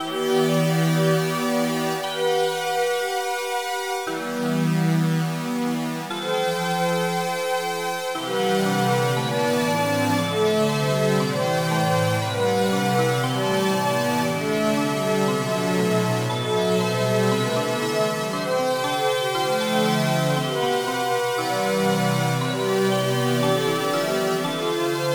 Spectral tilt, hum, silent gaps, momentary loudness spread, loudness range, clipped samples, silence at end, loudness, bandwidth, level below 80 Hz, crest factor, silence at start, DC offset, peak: -5 dB/octave; none; none; 4 LU; 2 LU; under 0.1%; 0 s; -22 LUFS; over 20 kHz; -70 dBFS; 14 dB; 0 s; under 0.1%; -8 dBFS